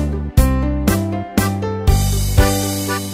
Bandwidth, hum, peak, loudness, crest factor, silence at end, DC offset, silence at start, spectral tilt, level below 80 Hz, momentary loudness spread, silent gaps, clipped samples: 16 kHz; none; -2 dBFS; -17 LUFS; 14 dB; 0 s; under 0.1%; 0 s; -5.5 dB/octave; -20 dBFS; 5 LU; none; under 0.1%